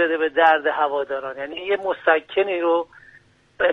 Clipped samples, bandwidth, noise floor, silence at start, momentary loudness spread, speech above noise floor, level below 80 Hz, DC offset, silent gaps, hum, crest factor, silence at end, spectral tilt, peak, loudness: under 0.1%; 6 kHz; -53 dBFS; 0 s; 12 LU; 33 dB; -62 dBFS; under 0.1%; none; none; 18 dB; 0 s; -5 dB/octave; -4 dBFS; -21 LUFS